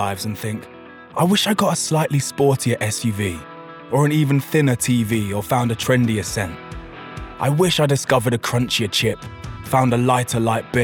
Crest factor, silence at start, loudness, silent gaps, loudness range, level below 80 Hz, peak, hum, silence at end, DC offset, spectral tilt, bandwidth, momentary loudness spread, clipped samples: 18 dB; 0 s; -19 LUFS; none; 1 LU; -46 dBFS; -2 dBFS; none; 0 s; under 0.1%; -5 dB/octave; 19.5 kHz; 17 LU; under 0.1%